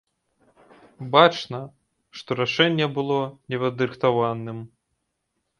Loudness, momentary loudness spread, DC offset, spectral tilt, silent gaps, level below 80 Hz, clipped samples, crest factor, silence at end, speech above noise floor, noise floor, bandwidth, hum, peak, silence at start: -22 LUFS; 21 LU; under 0.1%; -6 dB/octave; none; -66 dBFS; under 0.1%; 24 dB; 0.95 s; 54 dB; -77 dBFS; 10.5 kHz; none; 0 dBFS; 1 s